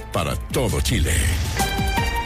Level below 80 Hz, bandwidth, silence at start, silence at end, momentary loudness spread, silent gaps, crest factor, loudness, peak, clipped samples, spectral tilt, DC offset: -26 dBFS; 16 kHz; 0 s; 0 s; 4 LU; none; 14 dB; -22 LUFS; -8 dBFS; under 0.1%; -4 dB/octave; under 0.1%